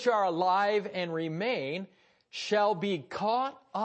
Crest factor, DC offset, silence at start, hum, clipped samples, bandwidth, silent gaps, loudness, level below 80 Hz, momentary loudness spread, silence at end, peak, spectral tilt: 16 dB; under 0.1%; 0 s; none; under 0.1%; 8.6 kHz; none; -30 LUFS; -80 dBFS; 11 LU; 0 s; -14 dBFS; -5 dB/octave